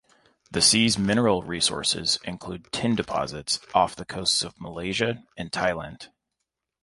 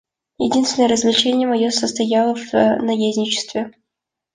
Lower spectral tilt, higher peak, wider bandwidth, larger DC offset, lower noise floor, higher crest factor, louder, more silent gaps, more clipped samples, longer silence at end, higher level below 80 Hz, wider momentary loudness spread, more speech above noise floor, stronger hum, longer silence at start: about the same, -3 dB/octave vs -3.5 dB/octave; second, -6 dBFS vs -2 dBFS; first, 11.5 kHz vs 9.8 kHz; neither; about the same, -83 dBFS vs -82 dBFS; about the same, 20 dB vs 16 dB; second, -24 LUFS vs -17 LUFS; neither; neither; about the same, 0.75 s vs 0.65 s; first, -52 dBFS vs -58 dBFS; first, 14 LU vs 7 LU; second, 57 dB vs 65 dB; neither; about the same, 0.5 s vs 0.4 s